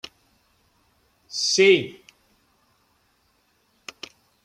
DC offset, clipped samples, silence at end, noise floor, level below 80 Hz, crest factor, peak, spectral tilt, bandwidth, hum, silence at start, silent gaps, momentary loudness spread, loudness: under 0.1%; under 0.1%; 2.5 s; -66 dBFS; -72 dBFS; 22 dB; -6 dBFS; -2.5 dB/octave; 10.5 kHz; none; 1.3 s; none; 26 LU; -19 LUFS